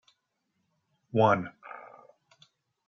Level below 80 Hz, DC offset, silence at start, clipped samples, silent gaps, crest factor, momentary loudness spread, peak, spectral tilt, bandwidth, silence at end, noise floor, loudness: -78 dBFS; under 0.1%; 1.15 s; under 0.1%; none; 22 dB; 22 LU; -10 dBFS; -6 dB/octave; 7 kHz; 1.1 s; -79 dBFS; -26 LUFS